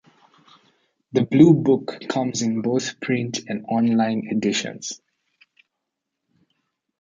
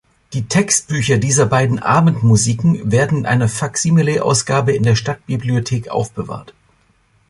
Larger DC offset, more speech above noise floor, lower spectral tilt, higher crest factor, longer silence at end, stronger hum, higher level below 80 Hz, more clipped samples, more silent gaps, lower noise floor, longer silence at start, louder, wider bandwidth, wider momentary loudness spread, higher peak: neither; first, 61 dB vs 41 dB; about the same, -5.5 dB/octave vs -5 dB/octave; about the same, 20 dB vs 16 dB; first, 2.05 s vs 0.8 s; neither; second, -64 dBFS vs -44 dBFS; neither; neither; first, -81 dBFS vs -57 dBFS; first, 1.15 s vs 0.3 s; second, -21 LUFS vs -15 LUFS; second, 9.2 kHz vs 11.5 kHz; first, 14 LU vs 9 LU; about the same, -2 dBFS vs 0 dBFS